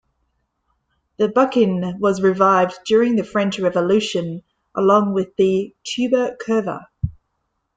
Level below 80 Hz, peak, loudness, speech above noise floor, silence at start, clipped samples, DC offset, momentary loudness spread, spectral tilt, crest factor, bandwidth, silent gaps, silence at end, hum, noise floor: -50 dBFS; -2 dBFS; -19 LUFS; 55 dB; 1.2 s; under 0.1%; under 0.1%; 13 LU; -6 dB/octave; 16 dB; 9.2 kHz; none; 0.65 s; none; -73 dBFS